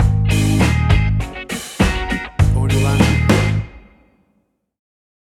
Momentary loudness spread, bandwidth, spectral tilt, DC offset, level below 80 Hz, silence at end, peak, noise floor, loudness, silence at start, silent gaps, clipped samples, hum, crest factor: 10 LU; 14.5 kHz; -6 dB/octave; under 0.1%; -24 dBFS; 1.6 s; 0 dBFS; -64 dBFS; -17 LUFS; 0 s; none; under 0.1%; none; 16 dB